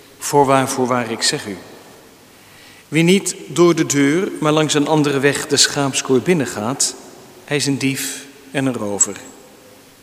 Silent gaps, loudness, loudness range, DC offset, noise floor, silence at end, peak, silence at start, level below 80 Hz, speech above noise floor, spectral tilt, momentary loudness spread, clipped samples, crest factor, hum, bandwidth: none; -17 LUFS; 5 LU; under 0.1%; -45 dBFS; 0.7 s; 0 dBFS; 0.2 s; -60 dBFS; 28 dB; -3.5 dB/octave; 10 LU; under 0.1%; 18 dB; none; 16 kHz